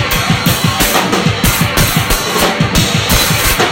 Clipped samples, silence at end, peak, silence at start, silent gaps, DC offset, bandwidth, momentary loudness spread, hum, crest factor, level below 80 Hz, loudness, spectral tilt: under 0.1%; 0 s; 0 dBFS; 0 s; none; under 0.1%; 17 kHz; 2 LU; none; 12 dB; -24 dBFS; -11 LUFS; -3.5 dB/octave